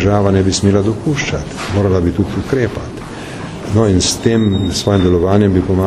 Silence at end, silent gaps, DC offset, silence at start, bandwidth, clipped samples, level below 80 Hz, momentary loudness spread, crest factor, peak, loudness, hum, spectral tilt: 0 s; none; under 0.1%; 0 s; 13 kHz; under 0.1%; -32 dBFS; 14 LU; 14 dB; 0 dBFS; -14 LUFS; none; -5.5 dB/octave